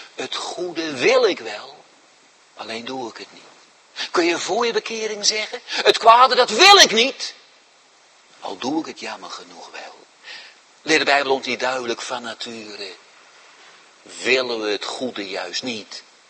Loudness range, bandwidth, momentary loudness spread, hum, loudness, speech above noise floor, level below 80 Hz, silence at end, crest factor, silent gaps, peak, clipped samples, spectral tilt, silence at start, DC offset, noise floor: 13 LU; 16 kHz; 24 LU; none; -18 LUFS; 34 dB; -70 dBFS; 0.3 s; 22 dB; none; 0 dBFS; under 0.1%; -1 dB/octave; 0 s; under 0.1%; -53 dBFS